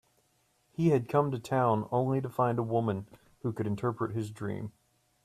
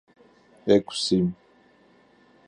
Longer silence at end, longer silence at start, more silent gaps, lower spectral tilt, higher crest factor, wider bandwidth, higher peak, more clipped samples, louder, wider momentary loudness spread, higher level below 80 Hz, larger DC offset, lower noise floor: second, 0.55 s vs 1.15 s; first, 0.8 s vs 0.65 s; neither; first, -8.5 dB/octave vs -5.5 dB/octave; about the same, 18 dB vs 22 dB; first, 14 kHz vs 10.5 kHz; second, -12 dBFS vs -6 dBFS; neither; second, -31 LUFS vs -24 LUFS; about the same, 11 LU vs 13 LU; second, -68 dBFS vs -58 dBFS; neither; first, -71 dBFS vs -58 dBFS